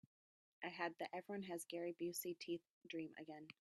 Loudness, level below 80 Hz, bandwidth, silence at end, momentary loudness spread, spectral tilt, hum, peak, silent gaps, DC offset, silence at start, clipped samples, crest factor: -49 LUFS; under -90 dBFS; 14.5 kHz; 0.1 s; 7 LU; -4 dB/octave; none; -28 dBFS; 2.70-2.81 s; under 0.1%; 0.6 s; under 0.1%; 22 dB